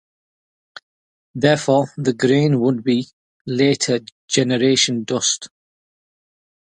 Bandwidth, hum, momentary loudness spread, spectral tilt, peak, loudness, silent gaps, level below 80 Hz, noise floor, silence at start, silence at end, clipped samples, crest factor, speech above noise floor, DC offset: 9.8 kHz; none; 10 LU; -4.5 dB/octave; 0 dBFS; -18 LUFS; 3.13-3.45 s, 4.12-4.28 s; -62 dBFS; under -90 dBFS; 1.35 s; 1.2 s; under 0.1%; 20 dB; over 72 dB; under 0.1%